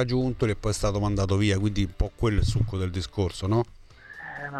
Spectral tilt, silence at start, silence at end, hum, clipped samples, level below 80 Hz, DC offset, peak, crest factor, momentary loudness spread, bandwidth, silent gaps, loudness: -6 dB/octave; 0 s; 0 s; none; under 0.1%; -36 dBFS; under 0.1%; -10 dBFS; 16 dB; 12 LU; 12.5 kHz; none; -27 LUFS